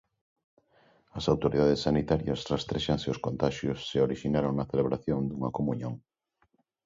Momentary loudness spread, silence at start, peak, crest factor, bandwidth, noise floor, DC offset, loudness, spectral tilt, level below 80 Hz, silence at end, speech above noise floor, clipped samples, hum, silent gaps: 8 LU; 1.15 s; -12 dBFS; 18 dB; 7.8 kHz; -73 dBFS; under 0.1%; -29 LUFS; -7 dB/octave; -50 dBFS; 0.9 s; 45 dB; under 0.1%; none; none